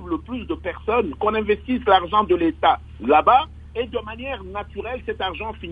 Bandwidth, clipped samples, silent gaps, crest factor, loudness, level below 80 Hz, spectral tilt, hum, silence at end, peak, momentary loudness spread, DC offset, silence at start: 4.9 kHz; under 0.1%; none; 20 dB; -21 LUFS; -40 dBFS; -7.5 dB/octave; none; 0 s; -2 dBFS; 13 LU; under 0.1%; 0 s